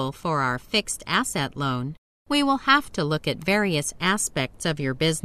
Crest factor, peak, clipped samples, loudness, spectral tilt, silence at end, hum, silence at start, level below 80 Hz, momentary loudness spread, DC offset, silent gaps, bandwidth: 20 dB; -4 dBFS; under 0.1%; -24 LUFS; -3.5 dB/octave; 0.05 s; none; 0 s; -52 dBFS; 7 LU; under 0.1%; 1.98-2.25 s; 14 kHz